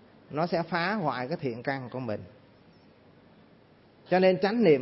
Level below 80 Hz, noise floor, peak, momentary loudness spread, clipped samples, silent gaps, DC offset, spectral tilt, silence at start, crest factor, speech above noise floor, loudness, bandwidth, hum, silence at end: -72 dBFS; -58 dBFS; -10 dBFS; 12 LU; under 0.1%; none; under 0.1%; -10 dB/octave; 0.3 s; 20 dB; 31 dB; -28 LUFS; 5.8 kHz; none; 0 s